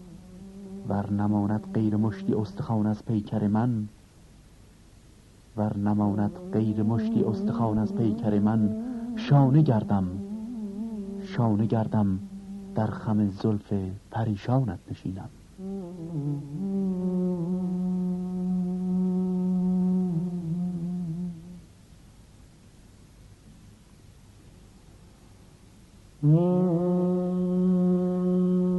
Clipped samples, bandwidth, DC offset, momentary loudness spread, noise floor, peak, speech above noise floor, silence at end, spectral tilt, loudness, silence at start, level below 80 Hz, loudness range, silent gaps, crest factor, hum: under 0.1%; 8.6 kHz; under 0.1%; 12 LU; -53 dBFS; -8 dBFS; 28 dB; 0 s; -9.5 dB/octave; -27 LUFS; 0 s; -56 dBFS; 6 LU; none; 18 dB; none